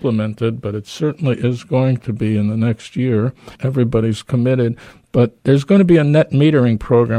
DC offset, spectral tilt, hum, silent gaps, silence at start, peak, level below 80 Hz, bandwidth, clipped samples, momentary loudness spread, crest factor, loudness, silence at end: under 0.1%; -8.5 dB/octave; none; none; 0 s; -2 dBFS; -44 dBFS; 10.5 kHz; under 0.1%; 9 LU; 14 dB; -16 LUFS; 0 s